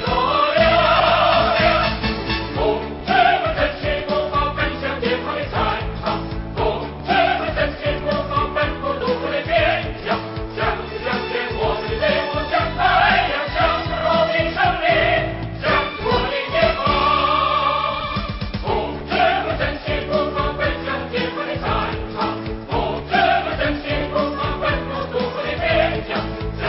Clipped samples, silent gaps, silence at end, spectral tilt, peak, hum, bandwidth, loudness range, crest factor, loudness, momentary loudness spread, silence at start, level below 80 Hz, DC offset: under 0.1%; none; 0 s; -9.5 dB/octave; -4 dBFS; none; 5.8 kHz; 4 LU; 16 dB; -19 LUFS; 9 LU; 0 s; -32 dBFS; under 0.1%